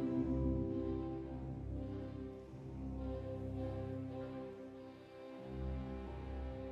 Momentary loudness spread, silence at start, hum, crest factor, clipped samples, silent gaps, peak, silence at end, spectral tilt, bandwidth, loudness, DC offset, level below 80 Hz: 14 LU; 0 s; none; 16 dB; under 0.1%; none; -26 dBFS; 0 s; -10 dB/octave; 6.6 kHz; -44 LUFS; under 0.1%; -50 dBFS